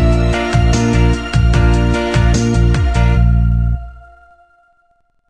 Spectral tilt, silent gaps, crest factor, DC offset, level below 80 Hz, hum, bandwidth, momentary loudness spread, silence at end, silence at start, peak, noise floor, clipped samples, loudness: -6.5 dB/octave; none; 12 dB; 0.6%; -16 dBFS; none; 9.4 kHz; 2 LU; 1.3 s; 0 s; 0 dBFS; -58 dBFS; under 0.1%; -14 LUFS